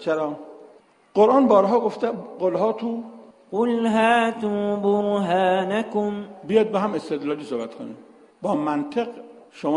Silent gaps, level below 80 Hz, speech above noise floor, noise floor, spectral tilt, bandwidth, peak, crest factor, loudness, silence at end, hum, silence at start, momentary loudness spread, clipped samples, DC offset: none; -68 dBFS; 31 dB; -52 dBFS; -6.5 dB/octave; 10.5 kHz; -4 dBFS; 18 dB; -22 LUFS; 0 s; none; 0 s; 14 LU; under 0.1%; under 0.1%